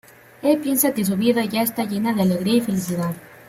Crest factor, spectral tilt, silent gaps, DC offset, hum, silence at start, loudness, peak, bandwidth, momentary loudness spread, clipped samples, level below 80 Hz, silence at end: 16 dB; -5 dB/octave; none; under 0.1%; none; 0.4 s; -21 LUFS; -4 dBFS; 16.5 kHz; 6 LU; under 0.1%; -60 dBFS; 0.05 s